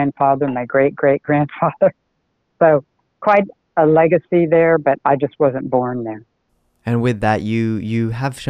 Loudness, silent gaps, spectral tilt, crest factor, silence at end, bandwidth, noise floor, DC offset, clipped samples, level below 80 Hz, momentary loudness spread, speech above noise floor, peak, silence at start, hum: -17 LUFS; none; -8 dB/octave; 16 dB; 0 s; 11 kHz; -68 dBFS; under 0.1%; under 0.1%; -50 dBFS; 9 LU; 52 dB; 0 dBFS; 0 s; none